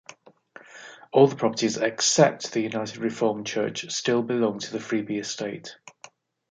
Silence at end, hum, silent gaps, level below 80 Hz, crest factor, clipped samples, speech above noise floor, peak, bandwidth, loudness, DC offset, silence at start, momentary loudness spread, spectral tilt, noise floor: 0.6 s; none; none; -74 dBFS; 22 dB; under 0.1%; 28 dB; -4 dBFS; 9.6 kHz; -24 LUFS; under 0.1%; 0.75 s; 18 LU; -4 dB/octave; -52 dBFS